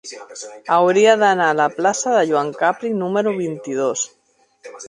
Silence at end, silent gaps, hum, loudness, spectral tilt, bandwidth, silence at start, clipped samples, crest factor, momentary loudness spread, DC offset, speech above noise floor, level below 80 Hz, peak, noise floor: 0 s; none; none; -17 LUFS; -3.5 dB/octave; 11 kHz; 0.05 s; under 0.1%; 16 dB; 14 LU; under 0.1%; 32 dB; -70 dBFS; -2 dBFS; -49 dBFS